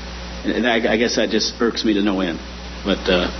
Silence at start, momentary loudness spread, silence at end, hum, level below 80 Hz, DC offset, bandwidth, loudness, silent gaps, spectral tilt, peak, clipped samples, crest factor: 0 s; 10 LU; 0 s; none; -36 dBFS; under 0.1%; 6.4 kHz; -19 LUFS; none; -4 dB/octave; -4 dBFS; under 0.1%; 16 dB